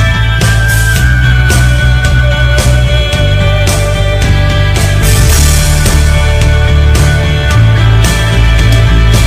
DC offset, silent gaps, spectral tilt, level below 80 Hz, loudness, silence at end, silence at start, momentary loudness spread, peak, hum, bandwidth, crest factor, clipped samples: under 0.1%; none; -4.5 dB/octave; -10 dBFS; -8 LUFS; 0 s; 0 s; 2 LU; 0 dBFS; none; 16 kHz; 6 dB; 0.3%